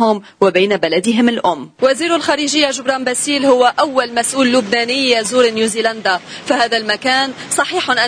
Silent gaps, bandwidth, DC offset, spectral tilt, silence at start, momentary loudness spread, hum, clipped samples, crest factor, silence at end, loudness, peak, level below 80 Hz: none; 10.5 kHz; under 0.1%; -2.5 dB/octave; 0 s; 5 LU; none; under 0.1%; 14 dB; 0 s; -14 LUFS; 0 dBFS; -58 dBFS